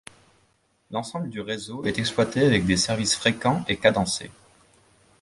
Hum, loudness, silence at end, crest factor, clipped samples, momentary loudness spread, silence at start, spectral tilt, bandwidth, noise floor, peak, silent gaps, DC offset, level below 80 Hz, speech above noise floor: none; -24 LUFS; 0.9 s; 22 dB; under 0.1%; 11 LU; 0.9 s; -4 dB/octave; 11.5 kHz; -66 dBFS; -4 dBFS; none; under 0.1%; -50 dBFS; 42 dB